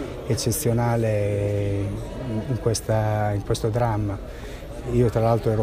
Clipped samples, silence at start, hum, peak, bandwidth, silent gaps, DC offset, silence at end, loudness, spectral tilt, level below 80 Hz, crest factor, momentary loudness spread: under 0.1%; 0 s; none; -6 dBFS; 15.5 kHz; none; under 0.1%; 0 s; -24 LUFS; -6 dB/octave; -38 dBFS; 16 dB; 10 LU